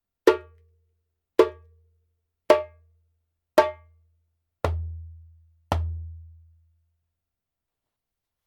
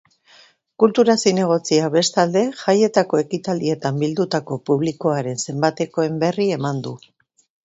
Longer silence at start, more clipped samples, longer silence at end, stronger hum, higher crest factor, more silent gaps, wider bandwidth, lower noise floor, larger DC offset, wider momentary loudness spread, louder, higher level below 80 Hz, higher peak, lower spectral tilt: second, 0.25 s vs 0.8 s; neither; first, 2.2 s vs 0.7 s; neither; first, 28 dB vs 18 dB; neither; first, 17.5 kHz vs 8.2 kHz; first, -86 dBFS vs -52 dBFS; neither; first, 20 LU vs 8 LU; second, -25 LUFS vs -19 LUFS; first, -44 dBFS vs -62 dBFS; about the same, 0 dBFS vs 0 dBFS; first, -6.5 dB/octave vs -5 dB/octave